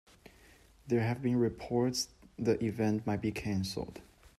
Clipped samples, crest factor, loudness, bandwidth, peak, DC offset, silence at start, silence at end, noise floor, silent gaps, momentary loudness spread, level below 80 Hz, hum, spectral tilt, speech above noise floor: under 0.1%; 18 dB; -33 LUFS; 14 kHz; -16 dBFS; under 0.1%; 0.85 s; 0.1 s; -60 dBFS; none; 8 LU; -60 dBFS; none; -6 dB/octave; 28 dB